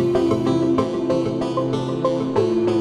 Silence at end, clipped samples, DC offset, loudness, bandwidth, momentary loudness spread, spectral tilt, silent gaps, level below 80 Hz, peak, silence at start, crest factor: 0 s; under 0.1%; under 0.1%; -21 LUFS; 10.5 kHz; 4 LU; -7.5 dB/octave; none; -48 dBFS; -6 dBFS; 0 s; 14 dB